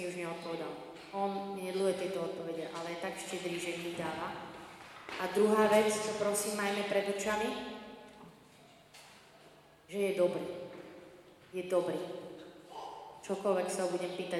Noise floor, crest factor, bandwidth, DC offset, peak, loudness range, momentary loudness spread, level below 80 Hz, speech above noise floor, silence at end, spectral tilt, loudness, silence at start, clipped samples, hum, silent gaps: -60 dBFS; 20 dB; 16 kHz; under 0.1%; -14 dBFS; 8 LU; 19 LU; -74 dBFS; 26 dB; 0 s; -4 dB/octave; -35 LUFS; 0 s; under 0.1%; none; none